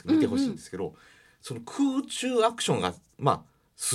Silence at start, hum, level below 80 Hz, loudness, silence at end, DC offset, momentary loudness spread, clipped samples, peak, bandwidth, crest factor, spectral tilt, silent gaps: 0.05 s; none; -68 dBFS; -28 LUFS; 0 s; under 0.1%; 13 LU; under 0.1%; -6 dBFS; 15 kHz; 22 dB; -4.5 dB/octave; none